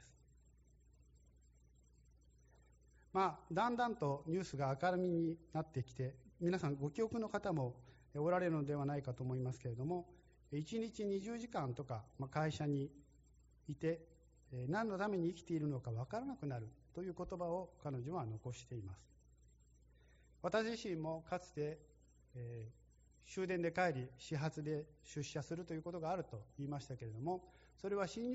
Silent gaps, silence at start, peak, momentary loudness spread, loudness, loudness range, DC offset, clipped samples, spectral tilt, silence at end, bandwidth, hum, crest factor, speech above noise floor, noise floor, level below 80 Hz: none; 0 s; -24 dBFS; 11 LU; -43 LUFS; 6 LU; under 0.1%; under 0.1%; -6.5 dB/octave; 0 s; 8 kHz; none; 20 dB; 27 dB; -69 dBFS; -68 dBFS